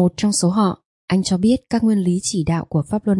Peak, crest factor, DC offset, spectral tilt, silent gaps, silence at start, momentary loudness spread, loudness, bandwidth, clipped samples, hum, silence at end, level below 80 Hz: -4 dBFS; 14 dB; under 0.1%; -5.5 dB/octave; 0.85-1.08 s; 0 s; 4 LU; -19 LUFS; 11.5 kHz; under 0.1%; none; 0 s; -48 dBFS